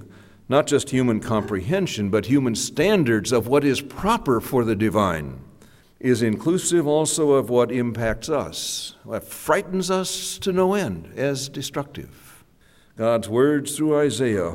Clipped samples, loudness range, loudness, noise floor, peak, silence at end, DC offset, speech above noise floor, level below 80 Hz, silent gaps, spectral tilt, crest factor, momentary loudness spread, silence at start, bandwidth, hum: under 0.1%; 4 LU; -22 LUFS; -55 dBFS; -4 dBFS; 0 s; under 0.1%; 34 dB; -48 dBFS; none; -5 dB/octave; 18 dB; 10 LU; 0 s; 16.5 kHz; none